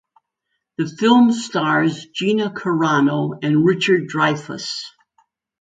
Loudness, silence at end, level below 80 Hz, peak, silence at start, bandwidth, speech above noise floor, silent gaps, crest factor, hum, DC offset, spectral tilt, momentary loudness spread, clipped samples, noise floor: -18 LUFS; 0.7 s; -66 dBFS; -2 dBFS; 0.8 s; 9.2 kHz; 58 dB; none; 18 dB; none; under 0.1%; -5.5 dB/octave; 12 LU; under 0.1%; -76 dBFS